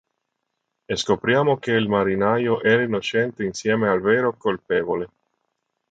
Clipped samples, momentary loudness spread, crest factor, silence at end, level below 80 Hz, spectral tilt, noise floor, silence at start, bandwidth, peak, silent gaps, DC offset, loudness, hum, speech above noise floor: under 0.1%; 8 LU; 18 dB; 0.85 s; -56 dBFS; -5.5 dB/octave; -78 dBFS; 0.9 s; 9 kHz; -4 dBFS; none; under 0.1%; -21 LUFS; none; 57 dB